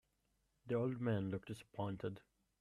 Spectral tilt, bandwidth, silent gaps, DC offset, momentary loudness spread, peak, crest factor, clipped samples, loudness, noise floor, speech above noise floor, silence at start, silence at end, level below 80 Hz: -8 dB/octave; 12.5 kHz; none; under 0.1%; 10 LU; -28 dBFS; 16 dB; under 0.1%; -43 LUFS; -82 dBFS; 40 dB; 0.65 s; 0.4 s; -74 dBFS